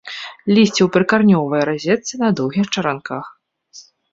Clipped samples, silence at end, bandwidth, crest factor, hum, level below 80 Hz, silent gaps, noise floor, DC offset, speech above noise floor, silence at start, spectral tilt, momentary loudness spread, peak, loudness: under 0.1%; 0.3 s; 7.8 kHz; 16 dB; none; -58 dBFS; none; -45 dBFS; under 0.1%; 29 dB; 0.05 s; -5.5 dB/octave; 14 LU; -2 dBFS; -16 LUFS